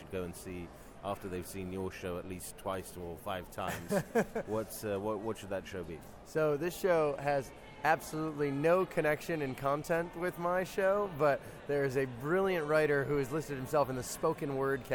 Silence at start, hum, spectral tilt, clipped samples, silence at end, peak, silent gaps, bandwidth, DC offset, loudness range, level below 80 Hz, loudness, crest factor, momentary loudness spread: 0 s; none; -5.5 dB/octave; under 0.1%; 0 s; -14 dBFS; none; 17.5 kHz; under 0.1%; 6 LU; -58 dBFS; -34 LUFS; 20 dB; 11 LU